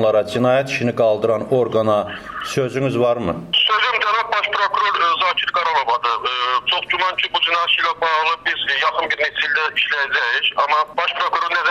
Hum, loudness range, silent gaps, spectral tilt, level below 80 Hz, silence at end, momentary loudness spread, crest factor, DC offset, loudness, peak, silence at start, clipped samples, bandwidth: none; 1 LU; none; -4 dB/octave; -56 dBFS; 0 s; 3 LU; 12 dB; under 0.1%; -17 LUFS; -6 dBFS; 0 s; under 0.1%; 13.5 kHz